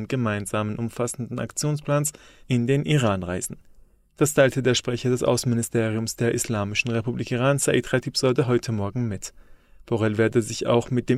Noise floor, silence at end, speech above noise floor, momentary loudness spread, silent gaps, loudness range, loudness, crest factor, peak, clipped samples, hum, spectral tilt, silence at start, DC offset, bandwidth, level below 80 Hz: -53 dBFS; 0 s; 29 dB; 8 LU; none; 2 LU; -24 LUFS; 16 dB; -6 dBFS; under 0.1%; none; -5 dB/octave; 0 s; under 0.1%; 16 kHz; -52 dBFS